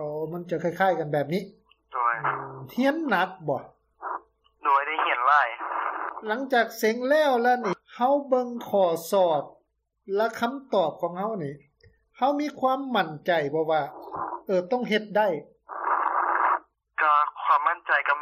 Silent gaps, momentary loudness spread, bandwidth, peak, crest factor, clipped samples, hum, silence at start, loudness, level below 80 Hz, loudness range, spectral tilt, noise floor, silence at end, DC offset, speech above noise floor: none; 12 LU; 15.5 kHz; -8 dBFS; 18 dB; under 0.1%; none; 0 s; -25 LUFS; -72 dBFS; 4 LU; -5 dB/octave; -71 dBFS; 0 s; under 0.1%; 46 dB